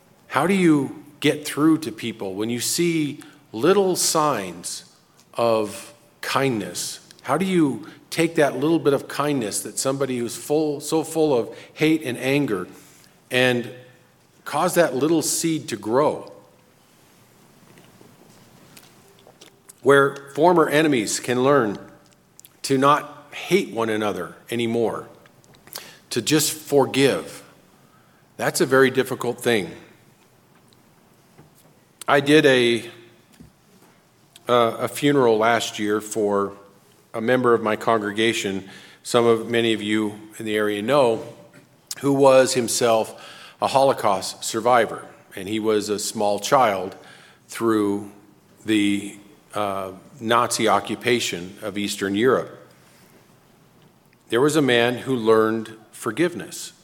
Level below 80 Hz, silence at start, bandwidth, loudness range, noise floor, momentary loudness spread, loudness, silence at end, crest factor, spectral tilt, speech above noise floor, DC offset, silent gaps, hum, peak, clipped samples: -68 dBFS; 0.3 s; 17.5 kHz; 4 LU; -56 dBFS; 16 LU; -21 LUFS; 0.15 s; 20 dB; -4 dB/octave; 35 dB; under 0.1%; none; none; -2 dBFS; under 0.1%